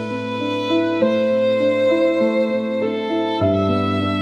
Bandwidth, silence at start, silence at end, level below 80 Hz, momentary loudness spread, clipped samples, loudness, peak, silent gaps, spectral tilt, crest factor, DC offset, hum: 8.4 kHz; 0 s; 0 s; -60 dBFS; 5 LU; under 0.1%; -19 LUFS; -6 dBFS; none; -7 dB/octave; 14 dB; under 0.1%; none